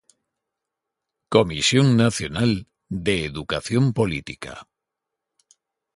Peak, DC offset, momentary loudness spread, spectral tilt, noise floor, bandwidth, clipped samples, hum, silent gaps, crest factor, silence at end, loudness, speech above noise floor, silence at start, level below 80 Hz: 0 dBFS; under 0.1%; 17 LU; -5 dB/octave; -84 dBFS; 11.5 kHz; under 0.1%; none; none; 22 dB; 1.35 s; -21 LUFS; 63 dB; 1.3 s; -48 dBFS